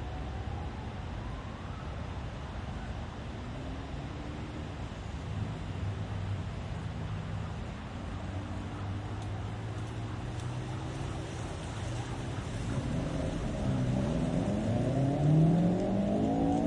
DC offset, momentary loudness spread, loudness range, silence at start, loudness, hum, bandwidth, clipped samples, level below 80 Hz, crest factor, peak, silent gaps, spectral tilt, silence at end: under 0.1%; 11 LU; 11 LU; 0 s; -35 LUFS; none; 11 kHz; under 0.1%; -44 dBFS; 18 dB; -16 dBFS; none; -7.5 dB/octave; 0 s